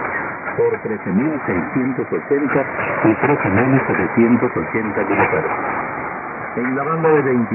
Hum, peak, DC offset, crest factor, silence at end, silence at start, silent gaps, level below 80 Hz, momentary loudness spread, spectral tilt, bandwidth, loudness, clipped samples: none; -2 dBFS; under 0.1%; 16 dB; 0 s; 0 s; none; -52 dBFS; 8 LU; -13.5 dB/octave; 3 kHz; -18 LUFS; under 0.1%